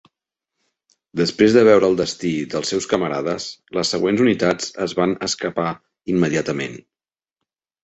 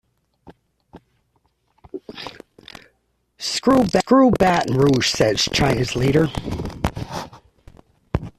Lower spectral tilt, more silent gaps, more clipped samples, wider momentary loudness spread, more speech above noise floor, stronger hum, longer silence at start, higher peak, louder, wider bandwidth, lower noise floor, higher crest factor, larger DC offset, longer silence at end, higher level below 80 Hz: about the same, -5 dB/octave vs -5 dB/octave; neither; neither; second, 13 LU vs 21 LU; first, 66 dB vs 50 dB; neither; first, 1.15 s vs 0.45 s; about the same, -2 dBFS vs -2 dBFS; about the same, -19 LUFS vs -19 LUFS; second, 8.4 kHz vs 14 kHz; first, -85 dBFS vs -67 dBFS; about the same, 18 dB vs 18 dB; neither; first, 1.05 s vs 0.1 s; second, -56 dBFS vs -40 dBFS